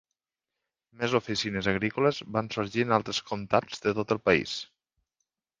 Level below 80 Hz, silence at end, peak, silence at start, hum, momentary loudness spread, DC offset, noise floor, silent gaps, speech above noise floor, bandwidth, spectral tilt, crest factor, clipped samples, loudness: -58 dBFS; 0.95 s; -6 dBFS; 1 s; none; 7 LU; under 0.1%; -89 dBFS; none; 61 dB; 9.8 kHz; -5 dB/octave; 24 dB; under 0.1%; -28 LUFS